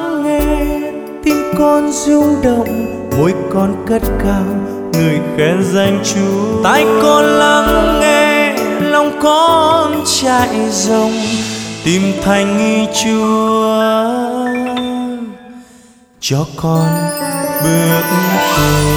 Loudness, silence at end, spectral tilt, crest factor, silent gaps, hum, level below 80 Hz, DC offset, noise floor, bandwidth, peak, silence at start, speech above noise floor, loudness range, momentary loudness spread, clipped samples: -13 LUFS; 0 s; -4.5 dB/octave; 12 dB; none; none; -30 dBFS; under 0.1%; -43 dBFS; over 20 kHz; 0 dBFS; 0 s; 31 dB; 6 LU; 8 LU; under 0.1%